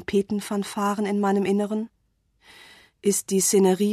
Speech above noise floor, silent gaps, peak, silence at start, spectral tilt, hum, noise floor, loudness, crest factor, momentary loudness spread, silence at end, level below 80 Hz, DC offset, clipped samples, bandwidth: 43 dB; none; -8 dBFS; 0 s; -4.5 dB/octave; none; -66 dBFS; -23 LUFS; 16 dB; 9 LU; 0 s; -62 dBFS; under 0.1%; under 0.1%; 14 kHz